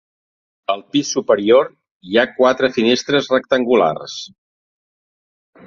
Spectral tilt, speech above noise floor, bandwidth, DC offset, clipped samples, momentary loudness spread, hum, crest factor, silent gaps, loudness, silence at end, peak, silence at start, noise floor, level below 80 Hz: -4 dB/octave; over 74 dB; 7.4 kHz; under 0.1%; under 0.1%; 13 LU; none; 18 dB; 1.91-2.00 s; -16 LUFS; 1.4 s; 0 dBFS; 0.7 s; under -90 dBFS; -60 dBFS